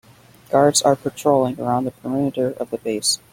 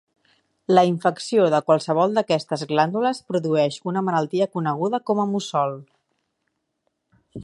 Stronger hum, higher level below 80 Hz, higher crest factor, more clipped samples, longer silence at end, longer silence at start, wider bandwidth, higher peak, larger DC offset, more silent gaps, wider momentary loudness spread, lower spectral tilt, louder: neither; first, -58 dBFS vs -66 dBFS; about the same, 18 dB vs 20 dB; neither; first, 0.15 s vs 0 s; second, 0.5 s vs 0.7 s; first, 16.5 kHz vs 11.5 kHz; about the same, -2 dBFS vs -2 dBFS; neither; neither; first, 9 LU vs 6 LU; second, -4 dB/octave vs -6 dB/octave; about the same, -20 LUFS vs -21 LUFS